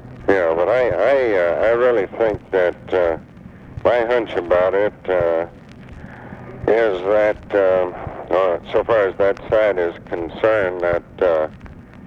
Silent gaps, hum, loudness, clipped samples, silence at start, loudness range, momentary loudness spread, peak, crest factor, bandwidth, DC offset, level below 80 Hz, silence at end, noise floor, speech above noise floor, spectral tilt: none; none; -18 LUFS; under 0.1%; 0 s; 2 LU; 11 LU; -2 dBFS; 16 dB; 7 kHz; under 0.1%; -44 dBFS; 0 s; -37 dBFS; 20 dB; -7 dB/octave